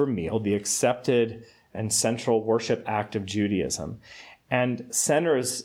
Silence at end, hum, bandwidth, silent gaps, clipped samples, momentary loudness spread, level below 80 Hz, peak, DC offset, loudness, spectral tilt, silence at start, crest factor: 0 s; none; 17 kHz; none; under 0.1%; 14 LU; -58 dBFS; -8 dBFS; under 0.1%; -25 LUFS; -4 dB/octave; 0 s; 18 dB